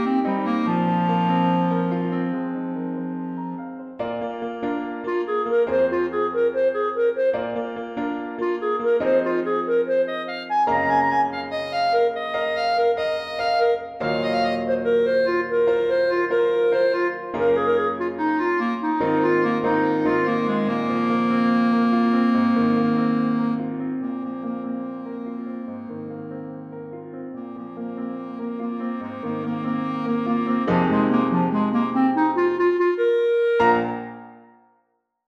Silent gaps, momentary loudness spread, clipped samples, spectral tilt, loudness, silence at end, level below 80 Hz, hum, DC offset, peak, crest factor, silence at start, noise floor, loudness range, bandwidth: none; 12 LU; under 0.1%; -8 dB/octave; -22 LUFS; 0.9 s; -60 dBFS; none; under 0.1%; -6 dBFS; 16 dB; 0 s; -70 dBFS; 10 LU; 7 kHz